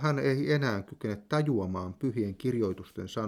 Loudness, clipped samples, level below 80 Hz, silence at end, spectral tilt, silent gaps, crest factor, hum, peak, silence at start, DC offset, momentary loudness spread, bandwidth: -31 LUFS; under 0.1%; -64 dBFS; 0 s; -7.5 dB/octave; none; 16 dB; none; -14 dBFS; 0 s; under 0.1%; 9 LU; 14.5 kHz